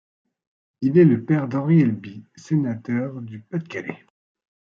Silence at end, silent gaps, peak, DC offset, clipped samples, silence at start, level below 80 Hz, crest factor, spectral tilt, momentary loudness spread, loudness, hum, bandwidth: 0.65 s; none; -4 dBFS; under 0.1%; under 0.1%; 0.8 s; -68 dBFS; 18 dB; -9.5 dB/octave; 18 LU; -21 LUFS; none; 7 kHz